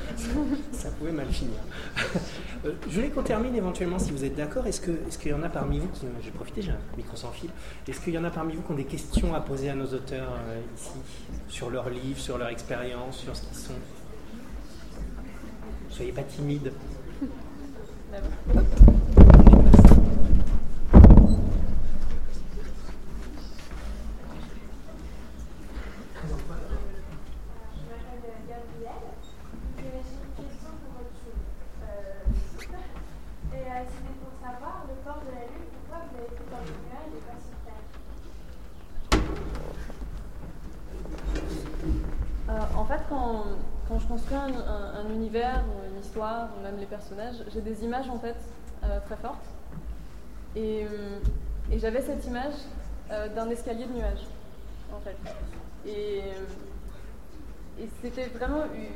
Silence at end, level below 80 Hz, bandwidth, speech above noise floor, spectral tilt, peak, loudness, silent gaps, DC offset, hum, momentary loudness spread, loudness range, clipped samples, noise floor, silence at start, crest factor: 0 s; -26 dBFS; 11.5 kHz; 16 dB; -7.5 dB/octave; 0 dBFS; -25 LUFS; none; 1%; none; 17 LU; 22 LU; under 0.1%; -44 dBFS; 0 s; 24 dB